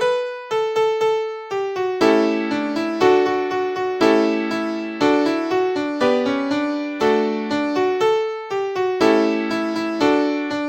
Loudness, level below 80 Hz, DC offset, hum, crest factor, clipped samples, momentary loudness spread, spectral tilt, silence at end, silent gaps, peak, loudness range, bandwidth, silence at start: -20 LUFS; -60 dBFS; under 0.1%; none; 18 dB; under 0.1%; 7 LU; -5 dB/octave; 0 s; none; -2 dBFS; 1 LU; 16.5 kHz; 0 s